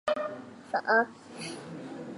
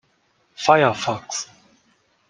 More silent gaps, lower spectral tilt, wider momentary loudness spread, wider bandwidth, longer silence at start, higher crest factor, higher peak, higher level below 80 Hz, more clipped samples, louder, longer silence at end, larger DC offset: neither; about the same, -4 dB/octave vs -3.5 dB/octave; first, 16 LU vs 13 LU; first, 11.5 kHz vs 10 kHz; second, 0.05 s vs 0.6 s; about the same, 20 dB vs 22 dB; second, -12 dBFS vs -2 dBFS; second, -76 dBFS vs -64 dBFS; neither; second, -31 LUFS vs -20 LUFS; second, 0 s vs 0.85 s; neither